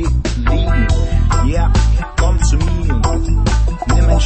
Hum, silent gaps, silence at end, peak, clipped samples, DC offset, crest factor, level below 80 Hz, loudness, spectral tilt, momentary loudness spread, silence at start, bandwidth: none; none; 0 s; 0 dBFS; under 0.1%; under 0.1%; 12 dB; -14 dBFS; -16 LUFS; -6 dB/octave; 2 LU; 0 s; 8.6 kHz